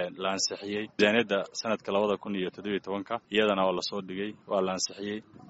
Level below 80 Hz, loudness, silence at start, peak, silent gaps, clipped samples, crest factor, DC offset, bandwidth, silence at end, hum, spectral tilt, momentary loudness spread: -70 dBFS; -29 LUFS; 0 s; -8 dBFS; none; under 0.1%; 22 dB; under 0.1%; 8 kHz; 0 s; none; -2.5 dB/octave; 10 LU